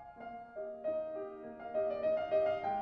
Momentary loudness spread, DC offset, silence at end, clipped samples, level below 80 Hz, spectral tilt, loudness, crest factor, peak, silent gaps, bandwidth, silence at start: 14 LU; under 0.1%; 0 s; under 0.1%; -72 dBFS; -7 dB/octave; -37 LUFS; 14 dB; -22 dBFS; none; 5.4 kHz; 0 s